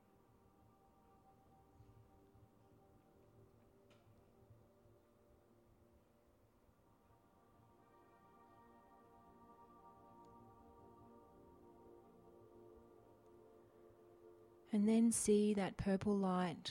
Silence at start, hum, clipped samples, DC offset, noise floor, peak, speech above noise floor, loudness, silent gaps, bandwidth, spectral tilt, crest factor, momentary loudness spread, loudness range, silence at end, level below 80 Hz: 14.25 s; none; under 0.1%; under 0.1%; -73 dBFS; -24 dBFS; 36 dB; -37 LUFS; none; 16 kHz; -5.5 dB/octave; 22 dB; 30 LU; 27 LU; 0 s; -72 dBFS